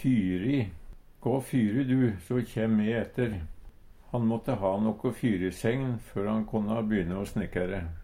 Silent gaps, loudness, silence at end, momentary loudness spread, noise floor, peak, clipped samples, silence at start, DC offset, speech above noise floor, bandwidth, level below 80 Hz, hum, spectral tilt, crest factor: none; -30 LUFS; 0 s; 6 LU; -49 dBFS; -14 dBFS; under 0.1%; 0 s; under 0.1%; 21 dB; 15.5 kHz; -48 dBFS; none; -8 dB/octave; 16 dB